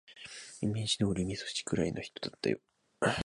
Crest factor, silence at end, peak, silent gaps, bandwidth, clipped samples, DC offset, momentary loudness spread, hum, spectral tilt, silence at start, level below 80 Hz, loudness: 18 dB; 0 s; -16 dBFS; none; 11.5 kHz; under 0.1%; under 0.1%; 12 LU; none; -4.5 dB/octave; 0.1 s; -56 dBFS; -34 LUFS